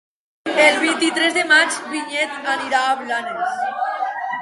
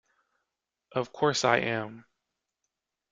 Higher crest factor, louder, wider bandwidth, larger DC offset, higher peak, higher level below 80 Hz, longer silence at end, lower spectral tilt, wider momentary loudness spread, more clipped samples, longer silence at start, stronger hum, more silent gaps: second, 20 dB vs 26 dB; first, -18 LUFS vs -28 LUFS; first, 11.5 kHz vs 9 kHz; neither; first, 0 dBFS vs -6 dBFS; about the same, -74 dBFS vs -70 dBFS; second, 0 s vs 1.1 s; second, -1 dB/octave vs -4 dB/octave; about the same, 10 LU vs 11 LU; neither; second, 0.45 s vs 0.95 s; neither; neither